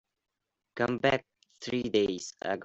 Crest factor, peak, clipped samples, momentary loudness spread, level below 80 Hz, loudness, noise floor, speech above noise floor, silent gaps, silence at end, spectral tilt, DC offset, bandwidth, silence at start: 22 dB; -10 dBFS; under 0.1%; 11 LU; -64 dBFS; -30 LUFS; -86 dBFS; 56 dB; none; 0 s; -4.5 dB/octave; under 0.1%; 8.2 kHz; 0.75 s